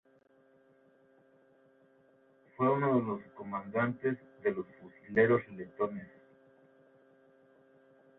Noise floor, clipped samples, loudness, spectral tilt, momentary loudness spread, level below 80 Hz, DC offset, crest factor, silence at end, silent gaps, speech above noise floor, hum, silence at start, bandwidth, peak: -66 dBFS; under 0.1%; -33 LUFS; -10.5 dB/octave; 19 LU; -74 dBFS; under 0.1%; 24 dB; 2.15 s; none; 34 dB; none; 2.6 s; 4 kHz; -12 dBFS